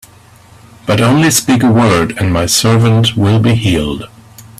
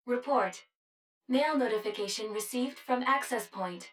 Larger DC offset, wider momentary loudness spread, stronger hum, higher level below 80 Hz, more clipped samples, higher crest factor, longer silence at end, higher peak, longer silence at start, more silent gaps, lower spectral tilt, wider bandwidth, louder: neither; about the same, 9 LU vs 7 LU; neither; first, -36 dBFS vs -84 dBFS; neither; second, 12 dB vs 18 dB; about the same, 0.15 s vs 0.05 s; first, 0 dBFS vs -14 dBFS; first, 0.85 s vs 0.05 s; second, none vs 0.75-1.21 s; first, -5 dB/octave vs -3 dB/octave; second, 15.5 kHz vs 17.5 kHz; first, -11 LUFS vs -31 LUFS